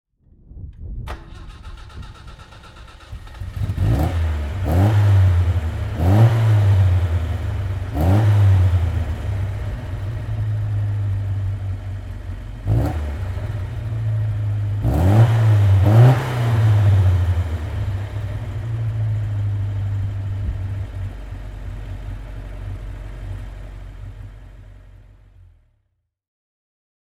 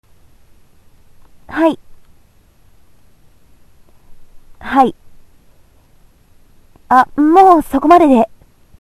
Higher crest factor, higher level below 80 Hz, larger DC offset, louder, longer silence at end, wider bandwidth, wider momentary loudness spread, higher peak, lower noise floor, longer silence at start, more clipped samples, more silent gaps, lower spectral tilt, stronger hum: about the same, 18 dB vs 16 dB; first, -30 dBFS vs -46 dBFS; neither; second, -19 LUFS vs -11 LUFS; first, 2.15 s vs 0.55 s; second, 12.5 kHz vs 14.5 kHz; first, 22 LU vs 13 LU; about the same, -2 dBFS vs 0 dBFS; first, -71 dBFS vs -50 dBFS; second, 0.5 s vs 1.5 s; second, under 0.1% vs 0.1%; neither; first, -8 dB/octave vs -6 dB/octave; neither